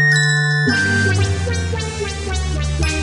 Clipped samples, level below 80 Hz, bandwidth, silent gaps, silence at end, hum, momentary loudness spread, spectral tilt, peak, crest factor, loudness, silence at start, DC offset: under 0.1%; -28 dBFS; 11 kHz; none; 0 s; none; 8 LU; -4.5 dB/octave; -4 dBFS; 14 dB; -17 LUFS; 0 s; under 0.1%